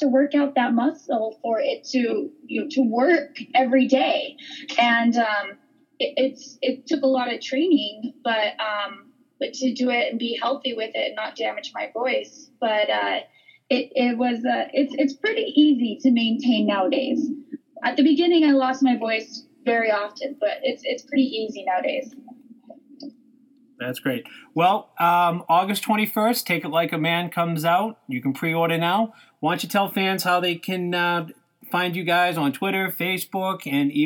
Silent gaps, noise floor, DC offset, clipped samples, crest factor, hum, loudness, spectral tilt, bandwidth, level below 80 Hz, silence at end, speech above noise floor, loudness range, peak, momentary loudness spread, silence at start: none; -56 dBFS; under 0.1%; under 0.1%; 16 dB; none; -22 LUFS; -5 dB/octave; 19.5 kHz; -82 dBFS; 0 s; 34 dB; 5 LU; -6 dBFS; 10 LU; 0 s